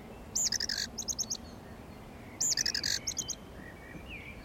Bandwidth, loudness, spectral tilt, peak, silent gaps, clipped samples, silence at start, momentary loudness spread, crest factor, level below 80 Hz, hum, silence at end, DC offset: 16.5 kHz; -32 LUFS; -0.5 dB/octave; -18 dBFS; none; under 0.1%; 0 s; 20 LU; 20 dB; -54 dBFS; none; 0 s; under 0.1%